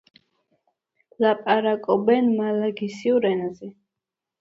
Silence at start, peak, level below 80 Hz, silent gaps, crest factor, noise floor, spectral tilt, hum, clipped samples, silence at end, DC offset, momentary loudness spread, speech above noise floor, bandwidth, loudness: 1.2 s; -6 dBFS; -70 dBFS; none; 18 dB; -86 dBFS; -7 dB/octave; none; under 0.1%; 0.7 s; under 0.1%; 10 LU; 65 dB; 7.8 kHz; -22 LUFS